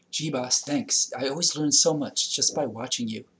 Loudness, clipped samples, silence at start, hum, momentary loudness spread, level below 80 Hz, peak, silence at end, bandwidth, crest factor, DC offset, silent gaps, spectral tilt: -24 LUFS; under 0.1%; 0.15 s; none; 9 LU; -74 dBFS; -8 dBFS; 0.15 s; 8 kHz; 18 dB; under 0.1%; none; -2 dB/octave